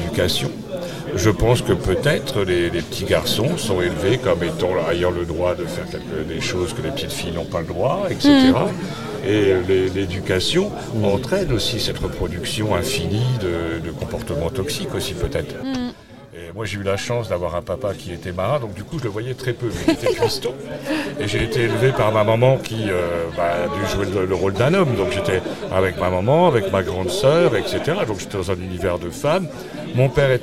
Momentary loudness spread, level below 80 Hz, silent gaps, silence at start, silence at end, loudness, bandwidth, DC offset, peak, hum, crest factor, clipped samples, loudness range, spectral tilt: 10 LU; -38 dBFS; none; 0 s; 0 s; -20 LUFS; 16.5 kHz; 0.6%; 0 dBFS; none; 20 dB; under 0.1%; 6 LU; -5.5 dB/octave